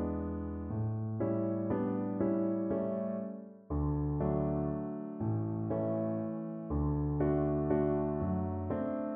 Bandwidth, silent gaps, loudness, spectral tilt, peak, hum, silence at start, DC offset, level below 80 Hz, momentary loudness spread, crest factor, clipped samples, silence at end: 3.3 kHz; none; -34 LUFS; -11.5 dB/octave; -18 dBFS; none; 0 s; under 0.1%; -46 dBFS; 7 LU; 16 dB; under 0.1%; 0 s